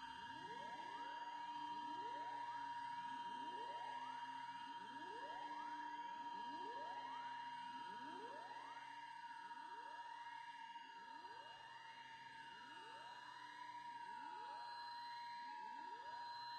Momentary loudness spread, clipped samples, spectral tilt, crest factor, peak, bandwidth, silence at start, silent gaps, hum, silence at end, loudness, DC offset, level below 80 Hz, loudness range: 7 LU; under 0.1%; -2.5 dB/octave; 12 dB; -40 dBFS; 10.5 kHz; 0 s; none; none; 0 s; -52 LUFS; under 0.1%; under -90 dBFS; 6 LU